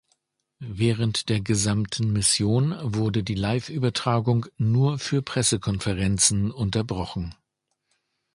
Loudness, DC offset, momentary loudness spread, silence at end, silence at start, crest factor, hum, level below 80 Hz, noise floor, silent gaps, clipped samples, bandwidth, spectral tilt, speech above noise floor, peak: -24 LUFS; under 0.1%; 7 LU; 1.05 s; 0.6 s; 20 dB; none; -46 dBFS; -78 dBFS; none; under 0.1%; 11.5 kHz; -4.5 dB/octave; 55 dB; -4 dBFS